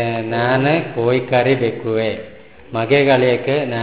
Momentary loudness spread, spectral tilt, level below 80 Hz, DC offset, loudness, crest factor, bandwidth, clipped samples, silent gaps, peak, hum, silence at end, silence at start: 9 LU; -10.5 dB/octave; -52 dBFS; 0.5%; -17 LUFS; 16 dB; 4 kHz; under 0.1%; none; 0 dBFS; none; 0 s; 0 s